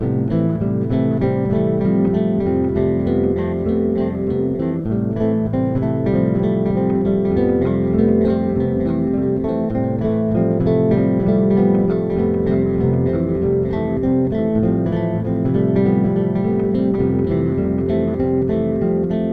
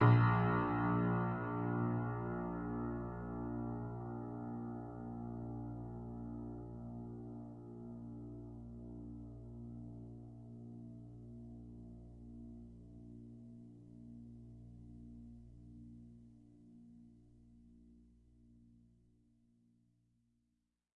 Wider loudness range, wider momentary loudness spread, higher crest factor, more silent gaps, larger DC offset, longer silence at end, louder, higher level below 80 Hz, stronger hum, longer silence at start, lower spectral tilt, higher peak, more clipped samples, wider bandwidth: second, 2 LU vs 21 LU; second, 4 LU vs 22 LU; second, 14 dB vs 24 dB; neither; first, 0.1% vs under 0.1%; second, 0 s vs 2.15 s; first, -18 LUFS vs -41 LUFS; first, -38 dBFS vs -60 dBFS; neither; about the same, 0 s vs 0 s; about the same, -11.5 dB/octave vs -10.5 dB/octave; first, -4 dBFS vs -18 dBFS; neither; about the same, 4.6 kHz vs 4.3 kHz